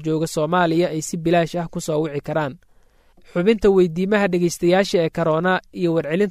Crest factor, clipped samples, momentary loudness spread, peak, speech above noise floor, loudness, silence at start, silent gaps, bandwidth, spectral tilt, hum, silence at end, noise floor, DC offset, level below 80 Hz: 16 dB; under 0.1%; 7 LU; -4 dBFS; 35 dB; -20 LUFS; 0 s; none; 15 kHz; -6 dB/octave; none; 0 s; -54 dBFS; under 0.1%; -48 dBFS